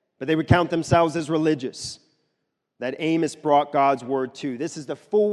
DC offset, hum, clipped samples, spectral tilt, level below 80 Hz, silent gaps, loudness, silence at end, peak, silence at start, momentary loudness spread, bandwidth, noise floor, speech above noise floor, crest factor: under 0.1%; none; under 0.1%; -6 dB/octave; -46 dBFS; none; -23 LUFS; 0 s; -2 dBFS; 0.2 s; 12 LU; 12 kHz; -77 dBFS; 55 dB; 20 dB